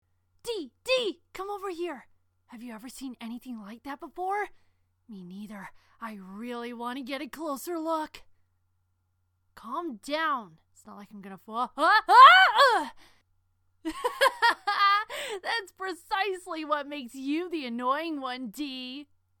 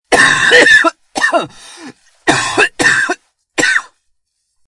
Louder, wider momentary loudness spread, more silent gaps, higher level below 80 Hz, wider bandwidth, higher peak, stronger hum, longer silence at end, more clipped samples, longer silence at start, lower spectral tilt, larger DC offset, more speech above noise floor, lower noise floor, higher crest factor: second, -25 LUFS vs -10 LUFS; first, 20 LU vs 13 LU; neither; second, -68 dBFS vs -48 dBFS; first, 18 kHz vs 12 kHz; second, -4 dBFS vs 0 dBFS; neither; second, 0.35 s vs 0.85 s; second, under 0.1% vs 0.1%; first, 0.45 s vs 0.1 s; about the same, -2.5 dB/octave vs -1.5 dB/octave; neither; second, 47 dB vs 53 dB; first, -74 dBFS vs -64 dBFS; first, 26 dB vs 14 dB